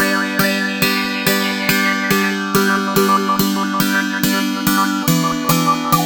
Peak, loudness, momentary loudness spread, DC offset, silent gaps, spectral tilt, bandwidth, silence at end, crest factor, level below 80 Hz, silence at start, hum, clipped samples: 0 dBFS; -16 LUFS; 2 LU; under 0.1%; none; -4 dB/octave; over 20 kHz; 0 s; 16 dB; -46 dBFS; 0 s; none; under 0.1%